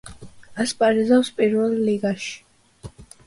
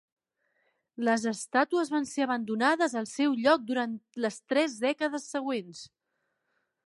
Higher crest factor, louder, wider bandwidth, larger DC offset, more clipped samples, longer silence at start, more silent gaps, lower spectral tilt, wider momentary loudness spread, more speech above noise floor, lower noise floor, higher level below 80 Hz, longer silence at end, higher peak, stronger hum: about the same, 16 dB vs 20 dB; first, -21 LUFS vs -29 LUFS; about the same, 11.5 kHz vs 11.5 kHz; neither; neither; second, 0.05 s vs 1 s; neither; first, -5 dB/octave vs -3.5 dB/octave; first, 19 LU vs 8 LU; second, 23 dB vs 51 dB; second, -43 dBFS vs -80 dBFS; first, -56 dBFS vs -80 dBFS; second, 0.2 s vs 1 s; first, -6 dBFS vs -10 dBFS; neither